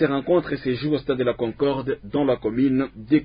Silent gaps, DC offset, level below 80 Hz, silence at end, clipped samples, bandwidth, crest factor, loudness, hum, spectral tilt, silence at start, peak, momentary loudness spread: none; under 0.1%; -50 dBFS; 0 s; under 0.1%; 5.2 kHz; 16 dB; -23 LUFS; none; -11.5 dB/octave; 0 s; -6 dBFS; 4 LU